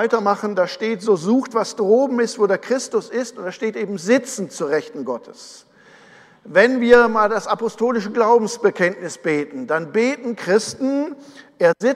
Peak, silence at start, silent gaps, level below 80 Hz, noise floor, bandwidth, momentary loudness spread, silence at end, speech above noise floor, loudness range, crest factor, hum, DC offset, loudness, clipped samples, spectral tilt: 0 dBFS; 0 s; none; -60 dBFS; -48 dBFS; 12.5 kHz; 10 LU; 0 s; 29 dB; 6 LU; 18 dB; none; under 0.1%; -19 LUFS; under 0.1%; -4.5 dB/octave